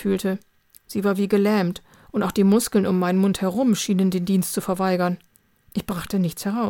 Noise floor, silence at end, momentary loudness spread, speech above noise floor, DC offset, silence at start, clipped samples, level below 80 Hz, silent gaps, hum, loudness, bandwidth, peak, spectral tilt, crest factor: -56 dBFS; 0 s; 11 LU; 35 dB; under 0.1%; 0 s; under 0.1%; -54 dBFS; none; none; -22 LUFS; 17.5 kHz; -6 dBFS; -6 dB/octave; 16 dB